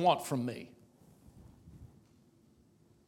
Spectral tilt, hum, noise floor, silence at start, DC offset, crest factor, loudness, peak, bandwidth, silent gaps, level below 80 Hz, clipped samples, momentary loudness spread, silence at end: -5.5 dB/octave; none; -66 dBFS; 0 s; under 0.1%; 24 dB; -35 LUFS; -14 dBFS; 16.5 kHz; none; -68 dBFS; under 0.1%; 27 LU; 1.2 s